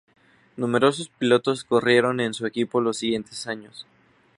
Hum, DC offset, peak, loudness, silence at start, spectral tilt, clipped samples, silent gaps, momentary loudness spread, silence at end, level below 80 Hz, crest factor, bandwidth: none; under 0.1%; -4 dBFS; -23 LUFS; 0.55 s; -4.5 dB/octave; under 0.1%; none; 13 LU; 0.55 s; -66 dBFS; 20 dB; 11.5 kHz